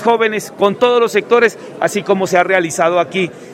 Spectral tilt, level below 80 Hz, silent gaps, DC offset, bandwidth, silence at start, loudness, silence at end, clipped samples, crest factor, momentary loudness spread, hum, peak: -4 dB/octave; -64 dBFS; none; under 0.1%; 16 kHz; 0 s; -14 LUFS; 0 s; under 0.1%; 14 dB; 6 LU; none; 0 dBFS